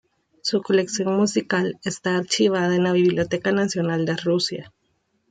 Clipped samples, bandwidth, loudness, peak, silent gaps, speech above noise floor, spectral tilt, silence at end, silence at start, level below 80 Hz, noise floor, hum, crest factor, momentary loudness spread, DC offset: under 0.1%; 9.4 kHz; -22 LUFS; -6 dBFS; none; 48 dB; -5 dB/octave; 0.65 s; 0.45 s; -62 dBFS; -69 dBFS; none; 16 dB; 6 LU; under 0.1%